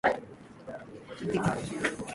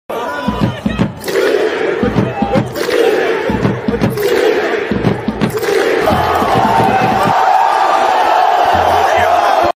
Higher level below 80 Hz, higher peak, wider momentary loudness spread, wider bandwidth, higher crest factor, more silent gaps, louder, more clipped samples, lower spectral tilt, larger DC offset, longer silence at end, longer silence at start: second, -58 dBFS vs -36 dBFS; second, -12 dBFS vs 0 dBFS; first, 16 LU vs 6 LU; second, 11.5 kHz vs 16 kHz; first, 22 dB vs 12 dB; neither; second, -32 LUFS vs -13 LUFS; neither; about the same, -5.5 dB/octave vs -5.5 dB/octave; neither; about the same, 0 s vs 0.05 s; about the same, 0.05 s vs 0.1 s